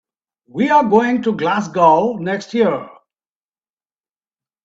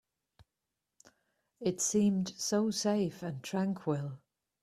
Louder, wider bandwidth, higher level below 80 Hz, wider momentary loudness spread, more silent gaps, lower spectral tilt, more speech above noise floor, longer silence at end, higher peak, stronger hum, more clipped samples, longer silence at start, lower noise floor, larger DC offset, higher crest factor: first, -16 LUFS vs -33 LUFS; second, 7.8 kHz vs 14.5 kHz; first, -60 dBFS vs -72 dBFS; about the same, 9 LU vs 9 LU; neither; first, -6.5 dB/octave vs -5 dB/octave; first, over 75 dB vs 56 dB; first, 1.75 s vs 0.45 s; first, 0 dBFS vs -18 dBFS; neither; neither; second, 0.55 s vs 1.6 s; about the same, under -90 dBFS vs -88 dBFS; neither; about the same, 18 dB vs 18 dB